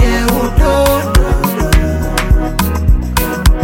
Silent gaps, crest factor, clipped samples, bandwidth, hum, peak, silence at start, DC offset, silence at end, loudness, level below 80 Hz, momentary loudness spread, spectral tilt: none; 10 dB; under 0.1%; 17 kHz; none; 0 dBFS; 0 s; under 0.1%; 0 s; -13 LUFS; -14 dBFS; 4 LU; -5.5 dB/octave